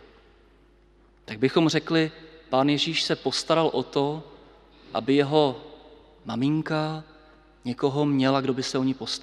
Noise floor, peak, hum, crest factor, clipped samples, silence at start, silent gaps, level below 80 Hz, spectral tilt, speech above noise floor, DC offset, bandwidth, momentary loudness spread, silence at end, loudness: -57 dBFS; -6 dBFS; none; 20 dB; under 0.1%; 1.3 s; none; -60 dBFS; -5.5 dB/octave; 33 dB; under 0.1%; 11.5 kHz; 13 LU; 0 s; -25 LUFS